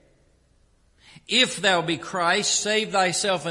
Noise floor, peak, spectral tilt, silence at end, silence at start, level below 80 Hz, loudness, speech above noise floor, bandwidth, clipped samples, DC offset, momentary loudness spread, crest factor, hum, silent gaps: -61 dBFS; -4 dBFS; -2 dB/octave; 0 s; 1.3 s; -62 dBFS; -21 LUFS; 38 dB; 11.5 kHz; under 0.1%; under 0.1%; 4 LU; 20 dB; none; none